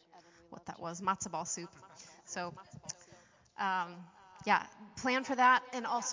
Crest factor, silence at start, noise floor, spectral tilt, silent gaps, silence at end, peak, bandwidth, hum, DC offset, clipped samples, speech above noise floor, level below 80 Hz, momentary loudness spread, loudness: 22 dB; 0.15 s; -62 dBFS; -2.5 dB/octave; none; 0 s; -14 dBFS; 7.8 kHz; none; under 0.1%; under 0.1%; 28 dB; -74 dBFS; 25 LU; -34 LUFS